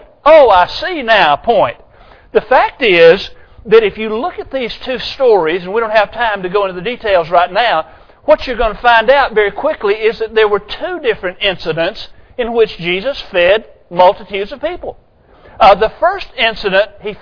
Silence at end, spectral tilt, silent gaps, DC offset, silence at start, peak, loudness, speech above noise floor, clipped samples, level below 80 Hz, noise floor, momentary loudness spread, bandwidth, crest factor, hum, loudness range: 0.05 s; -5.5 dB/octave; none; under 0.1%; 0.25 s; 0 dBFS; -12 LUFS; 31 dB; 0.6%; -36 dBFS; -42 dBFS; 12 LU; 5.4 kHz; 12 dB; none; 4 LU